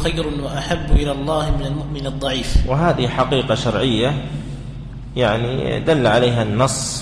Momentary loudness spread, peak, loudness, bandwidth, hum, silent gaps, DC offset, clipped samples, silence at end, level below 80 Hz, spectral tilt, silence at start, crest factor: 11 LU; -4 dBFS; -19 LUFS; 11 kHz; none; none; under 0.1%; under 0.1%; 0 s; -26 dBFS; -5 dB/octave; 0 s; 16 dB